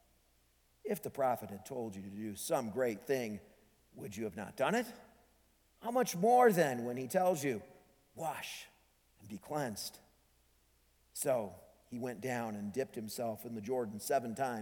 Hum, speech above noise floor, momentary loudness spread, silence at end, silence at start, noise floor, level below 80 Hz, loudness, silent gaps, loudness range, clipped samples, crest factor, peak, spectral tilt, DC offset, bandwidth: none; 36 dB; 14 LU; 0 s; 0.85 s; -72 dBFS; -74 dBFS; -36 LUFS; none; 9 LU; under 0.1%; 20 dB; -16 dBFS; -4.5 dB/octave; under 0.1%; 19 kHz